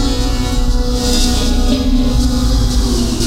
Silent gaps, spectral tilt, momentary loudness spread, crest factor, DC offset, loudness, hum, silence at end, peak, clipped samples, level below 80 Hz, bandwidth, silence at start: none; -5 dB/octave; 3 LU; 12 dB; under 0.1%; -15 LUFS; none; 0 s; 0 dBFS; under 0.1%; -14 dBFS; 16 kHz; 0 s